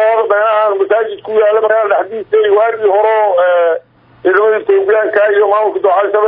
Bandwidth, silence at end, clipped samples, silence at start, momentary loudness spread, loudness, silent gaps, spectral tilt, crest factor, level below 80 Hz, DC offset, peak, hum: 3.9 kHz; 0 s; under 0.1%; 0 s; 4 LU; -11 LUFS; none; -7.5 dB/octave; 10 dB; -62 dBFS; under 0.1%; 0 dBFS; none